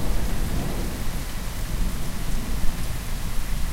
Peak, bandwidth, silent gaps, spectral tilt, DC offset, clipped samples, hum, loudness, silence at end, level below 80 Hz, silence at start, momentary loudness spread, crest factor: -6 dBFS; 16 kHz; none; -4.5 dB/octave; under 0.1%; under 0.1%; none; -31 LUFS; 0 s; -26 dBFS; 0 s; 3 LU; 16 dB